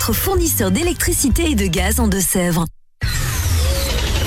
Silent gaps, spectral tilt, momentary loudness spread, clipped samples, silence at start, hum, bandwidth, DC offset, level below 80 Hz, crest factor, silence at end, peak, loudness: none; -4 dB/octave; 6 LU; under 0.1%; 0 s; none; 16.5 kHz; under 0.1%; -22 dBFS; 10 dB; 0 s; -6 dBFS; -17 LUFS